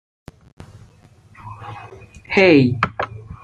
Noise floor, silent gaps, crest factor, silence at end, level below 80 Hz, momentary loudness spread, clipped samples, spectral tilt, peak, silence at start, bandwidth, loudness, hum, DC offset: -49 dBFS; none; 20 dB; 0.1 s; -50 dBFS; 25 LU; under 0.1%; -7 dB/octave; -2 dBFS; 1.45 s; 8.6 kHz; -16 LUFS; none; under 0.1%